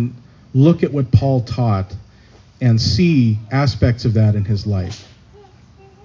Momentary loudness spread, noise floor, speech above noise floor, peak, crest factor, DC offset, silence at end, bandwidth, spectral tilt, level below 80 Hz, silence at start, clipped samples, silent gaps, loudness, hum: 10 LU; -46 dBFS; 31 dB; -2 dBFS; 16 dB; under 0.1%; 1.05 s; 7.4 kHz; -7.5 dB/octave; -34 dBFS; 0 s; under 0.1%; none; -16 LUFS; none